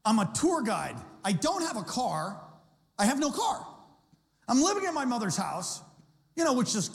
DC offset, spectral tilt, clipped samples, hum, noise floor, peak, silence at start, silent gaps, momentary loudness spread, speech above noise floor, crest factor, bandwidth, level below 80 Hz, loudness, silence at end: under 0.1%; -4 dB/octave; under 0.1%; none; -66 dBFS; -14 dBFS; 0.05 s; none; 13 LU; 37 dB; 16 dB; 16 kHz; -66 dBFS; -29 LUFS; 0 s